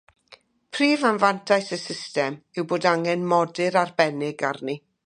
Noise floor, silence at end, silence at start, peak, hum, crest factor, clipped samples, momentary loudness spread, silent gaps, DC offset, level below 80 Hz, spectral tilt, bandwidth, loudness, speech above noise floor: -54 dBFS; 0.3 s; 0.3 s; -4 dBFS; none; 20 dB; under 0.1%; 10 LU; none; under 0.1%; -74 dBFS; -5 dB/octave; 11 kHz; -23 LUFS; 31 dB